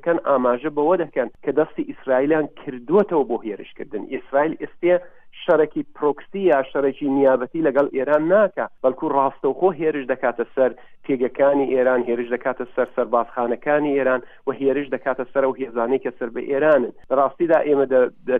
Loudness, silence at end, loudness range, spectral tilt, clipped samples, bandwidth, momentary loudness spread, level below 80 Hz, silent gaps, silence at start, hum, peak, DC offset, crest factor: -21 LUFS; 0 s; 3 LU; -9 dB/octave; under 0.1%; 3.8 kHz; 7 LU; -60 dBFS; none; 0.05 s; none; -4 dBFS; under 0.1%; 16 dB